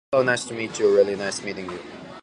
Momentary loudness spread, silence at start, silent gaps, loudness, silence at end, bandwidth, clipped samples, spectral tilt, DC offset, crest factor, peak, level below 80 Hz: 16 LU; 0.1 s; none; -23 LUFS; 0 s; 11.5 kHz; under 0.1%; -4 dB/octave; under 0.1%; 18 dB; -6 dBFS; -60 dBFS